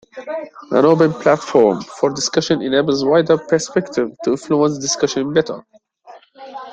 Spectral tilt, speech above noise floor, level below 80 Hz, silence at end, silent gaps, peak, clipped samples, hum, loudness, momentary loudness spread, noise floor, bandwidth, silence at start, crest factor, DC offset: -4.5 dB/octave; 27 dB; -58 dBFS; 0 s; none; 0 dBFS; under 0.1%; none; -16 LUFS; 14 LU; -44 dBFS; 9.2 kHz; 0.15 s; 16 dB; under 0.1%